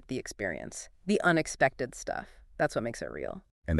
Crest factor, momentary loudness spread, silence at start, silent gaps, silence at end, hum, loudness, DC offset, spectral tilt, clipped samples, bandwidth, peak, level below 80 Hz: 22 dB; 14 LU; 0.1 s; 3.51-3.62 s; 0 s; none; -32 LUFS; under 0.1%; -5 dB/octave; under 0.1%; 13 kHz; -10 dBFS; -50 dBFS